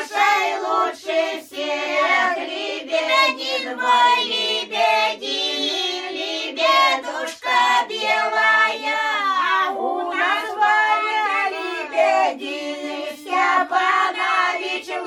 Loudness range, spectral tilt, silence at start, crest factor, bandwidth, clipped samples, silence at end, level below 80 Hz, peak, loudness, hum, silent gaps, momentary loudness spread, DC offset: 2 LU; -0.5 dB/octave; 0 s; 16 dB; 16 kHz; under 0.1%; 0 s; -70 dBFS; -4 dBFS; -19 LUFS; none; none; 9 LU; under 0.1%